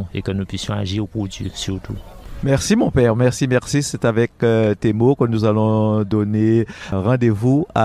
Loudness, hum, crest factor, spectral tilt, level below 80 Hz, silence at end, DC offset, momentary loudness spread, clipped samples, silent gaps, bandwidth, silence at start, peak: -18 LUFS; none; 16 dB; -6.5 dB/octave; -40 dBFS; 0 s; under 0.1%; 10 LU; under 0.1%; none; 13.5 kHz; 0 s; -2 dBFS